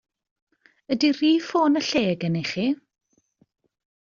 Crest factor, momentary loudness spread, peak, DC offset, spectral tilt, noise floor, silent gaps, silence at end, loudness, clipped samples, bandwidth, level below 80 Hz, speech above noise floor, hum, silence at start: 18 dB; 6 LU; -8 dBFS; under 0.1%; -4.5 dB/octave; -65 dBFS; none; 1.4 s; -23 LUFS; under 0.1%; 7.4 kHz; -66 dBFS; 43 dB; none; 0.9 s